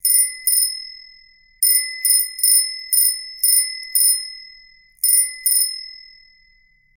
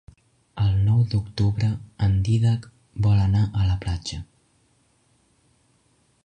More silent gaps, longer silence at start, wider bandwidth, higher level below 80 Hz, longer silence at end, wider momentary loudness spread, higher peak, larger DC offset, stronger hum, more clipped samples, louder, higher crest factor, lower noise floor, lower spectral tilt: neither; second, 0.05 s vs 0.55 s; first, 20 kHz vs 9.4 kHz; second, -62 dBFS vs -38 dBFS; second, 1 s vs 2 s; first, 15 LU vs 11 LU; first, 0 dBFS vs -10 dBFS; neither; neither; neither; first, -15 LUFS vs -23 LUFS; first, 20 dB vs 14 dB; second, -56 dBFS vs -64 dBFS; second, 8.5 dB/octave vs -7 dB/octave